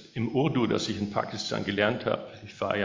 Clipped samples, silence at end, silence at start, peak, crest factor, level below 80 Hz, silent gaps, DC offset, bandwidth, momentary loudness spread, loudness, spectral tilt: under 0.1%; 0 s; 0 s; -8 dBFS; 20 dB; -58 dBFS; none; under 0.1%; 7.6 kHz; 7 LU; -29 LUFS; -5.5 dB/octave